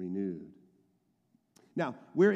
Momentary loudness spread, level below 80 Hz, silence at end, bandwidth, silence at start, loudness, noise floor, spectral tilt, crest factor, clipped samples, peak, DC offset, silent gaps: 14 LU; -82 dBFS; 0 s; 8 kHz; 0 s; -35 LUFS; -74 dBFS; -8 dB/octave; 20 dB; under 0.1%; -14 dBFS; under 0.1%; none